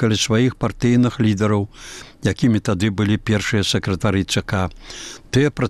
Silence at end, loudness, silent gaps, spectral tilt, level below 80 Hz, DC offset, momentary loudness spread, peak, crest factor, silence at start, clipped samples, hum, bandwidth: 0 s; -19 LUFS; none; -5.5 dB/octave; -42 dBFS; 0.4%; 12 LU; -6 dBFS; 14 dB; 0 s; under 0.1%; none; 13 kHz